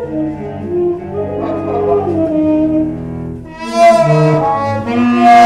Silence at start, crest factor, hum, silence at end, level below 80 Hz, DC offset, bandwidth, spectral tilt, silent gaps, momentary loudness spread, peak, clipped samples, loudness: 0 s; 10 dB; none; 0 s; -40 dBFS; under 0.1%; 11.5 kHz; -7 dB/octave; none; 14 LU; -2 dBFS; under 0.1%; -13 LUFS